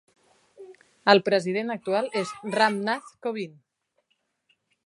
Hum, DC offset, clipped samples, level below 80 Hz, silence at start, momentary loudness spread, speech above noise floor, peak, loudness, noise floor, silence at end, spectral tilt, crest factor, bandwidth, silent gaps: none; under 0.1%; under 0.1%; -78 dBFS; 0.6 s; 12 LU; 50 dB; -2 dBFS; -25 LUFS; -74 dBFS; 1.35 s; -4.5 dB/octave; 26 dB; 11.5 kHz; none